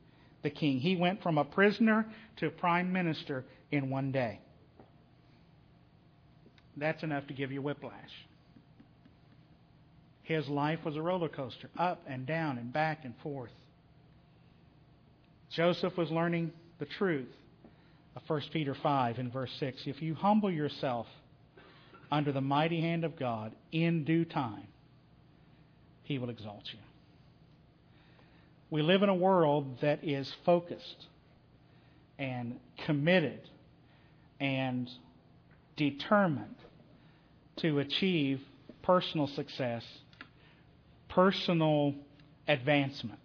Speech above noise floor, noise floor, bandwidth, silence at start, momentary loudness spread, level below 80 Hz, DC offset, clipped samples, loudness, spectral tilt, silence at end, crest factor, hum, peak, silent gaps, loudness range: 30 dB; -62 dBFS; 5.4 kHz; 0.45 s; 17 LU; -70 dBFS; under 0.1%; under 0.1%; -33 LUFS; -5 dB/octave; 0.1 s; 22 dB; none; -12 dBFS; none; 10 LU